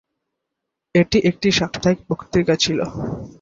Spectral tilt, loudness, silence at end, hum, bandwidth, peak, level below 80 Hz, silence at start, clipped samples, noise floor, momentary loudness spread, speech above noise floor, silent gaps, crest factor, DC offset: -5 dB/octave; -19 LUFS; 0.1 s; none; 7.8 kHz; -2 dBFS; -44 dBFS; 0.95 s; under 0.1%; -81 dBFS; 8 LU; 62 dB; none; 18 dB; under 0.1%